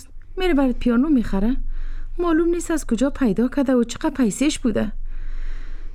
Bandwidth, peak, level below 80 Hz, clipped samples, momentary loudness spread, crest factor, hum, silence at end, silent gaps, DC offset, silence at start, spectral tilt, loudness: 13.5 kHz; -8 dBFS; -28 dBFS; under 0.1%; 17 LU; 12 dB; none; 0 s; none; under 0.1%; 0 s; -5.5 dB/octave; -21 LUFS